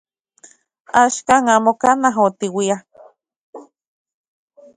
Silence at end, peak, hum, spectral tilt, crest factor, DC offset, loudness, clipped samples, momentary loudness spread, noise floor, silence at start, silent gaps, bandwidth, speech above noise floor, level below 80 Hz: 1.15 s; 0 dBFS; none; -3.5 dB/octave; 20 dB; under 0.1%; -16 LUFS; under 0.1%; 7 LU; -50 dBFS; 0.95 s; 3.36-3.53 s; 11.5 kHz; 35 dB; -62 dBFS